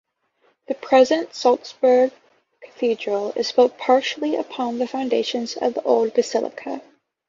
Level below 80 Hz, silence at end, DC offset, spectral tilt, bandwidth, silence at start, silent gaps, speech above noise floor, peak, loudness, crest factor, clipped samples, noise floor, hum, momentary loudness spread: -70 dBFS; 0.5 s; under 0.1%; -3.5 dB/octave; 7.6 kHz; 0.7 s; none; 44 dB; -4 dBFS; -21 LUFS; 18 dB; under 0.1%; -64 dBFS; none; 10 LU